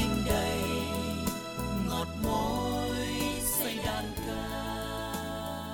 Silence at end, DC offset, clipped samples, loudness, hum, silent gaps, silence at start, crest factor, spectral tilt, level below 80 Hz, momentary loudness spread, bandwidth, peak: 0 s; under 0.1%; under 0.1%; -32 LUFS; none; none; 0 s; 18 dB; -4.5 dB/octave; -42 dBFS; 7 LU; over 20 kHz; -14 dBFS